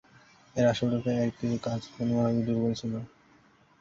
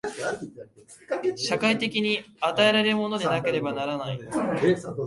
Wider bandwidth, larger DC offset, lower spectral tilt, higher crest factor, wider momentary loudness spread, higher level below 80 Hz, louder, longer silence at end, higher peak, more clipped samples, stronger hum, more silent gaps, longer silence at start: second, 7.6 kHz vs 11.5 kHz; neither; first, -7 dB/octave vs -4.5 dB/octave; about the same, 16 dB vs 18 dB; about the same, 10 LU vs 11 LU; about the same, -60 dBFS vs -64 dBFS; second, -29 LUFS vs -25 LUFS; first, 0.75 s vs 0 s; second, -14 dBFS vs -8 dBFS; neither; neither; neither; first, 0.55 s vs 0.05 s